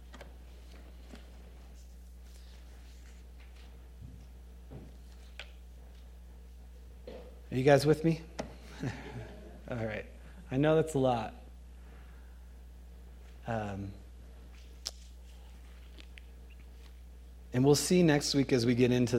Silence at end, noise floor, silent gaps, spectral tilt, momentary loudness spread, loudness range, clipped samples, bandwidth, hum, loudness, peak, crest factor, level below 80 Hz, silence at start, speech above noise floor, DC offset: 0 s; -50 dBFS; none; -5.5 dB/octave; 26 LU; 20 LU; under 0.1%; 16.5 kHz; none; -30 LUFS; -10 dBFS; 26 dB; -50 dBFS; 0 s; 22 dB; under 0.1%